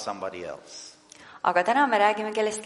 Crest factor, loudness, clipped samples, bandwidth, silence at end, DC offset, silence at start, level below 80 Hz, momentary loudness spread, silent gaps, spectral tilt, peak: 20 dB; -24 LUFS; under 0.1%; 11.5 kHz; 0 s; under 0.1%; 0 s; -72 dBFS; 21 LU; none; -3 dB/octave; -8 dBFS